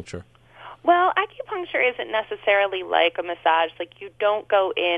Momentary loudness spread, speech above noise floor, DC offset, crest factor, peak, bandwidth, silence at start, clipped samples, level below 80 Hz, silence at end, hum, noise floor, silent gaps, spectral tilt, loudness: 12 LU; 22 dB; under 0.1%; 18 dB; -4 dBFS; 9.4 kHz; 0 s; under 0.1%; -62 dBFS; 0 s; none; -44 dBFS; none; -4.5 dB/octave; -22 LUFS